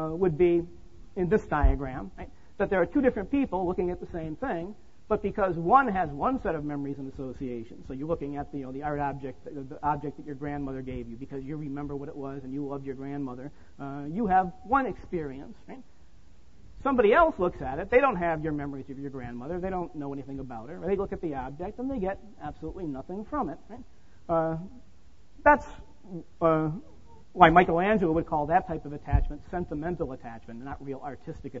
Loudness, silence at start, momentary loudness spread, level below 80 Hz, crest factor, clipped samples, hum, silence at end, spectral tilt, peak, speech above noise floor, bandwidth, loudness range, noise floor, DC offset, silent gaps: -29 LUFS; 0 s; 19 LU; -42 dBFS; 26 dB; under 0.1%; none; 0 s; -8.5 dB/octave; -4 dBFS; 29 dB; 7.6 kHz; 10 LU; -58 dBFS; 0.5%; none